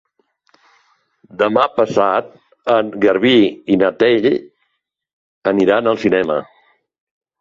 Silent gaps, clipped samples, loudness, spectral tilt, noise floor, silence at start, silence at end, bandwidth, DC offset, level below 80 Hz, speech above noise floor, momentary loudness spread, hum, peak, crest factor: 5.13-5.42 s; under 0.1%; -15 LUFS; -6.5 dB/octave; -71 dBFS; 1.35 s; 1 s; 7.6 kHz; under 0.1%; -56 dBFS; 57 dB; 9 LU; none; -2 dBFS; 16 dB